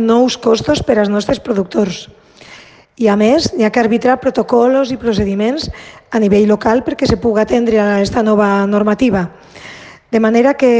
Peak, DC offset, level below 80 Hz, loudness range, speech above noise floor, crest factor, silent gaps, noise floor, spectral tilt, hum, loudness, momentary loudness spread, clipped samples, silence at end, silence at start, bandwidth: 0 dBFS; under 0.1%; -38 dBFS; 2 LU; 27 dB; 14 dB; none; -39 dBFS; -6 dB/octave; none; -13 LUFS; 8 LU; under 0.1%; 0 s; 0 s; 9.2 kHz